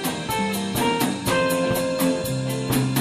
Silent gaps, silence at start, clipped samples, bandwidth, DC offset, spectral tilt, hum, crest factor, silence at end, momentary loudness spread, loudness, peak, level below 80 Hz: none; 0 s; under 0.1%; 15.5 kHz; under 0.1%; -4.5 dB/octave; none; 16 dB; 0 s; 4 LU; -23 LUFS; -8 dBFS; -48 dBFS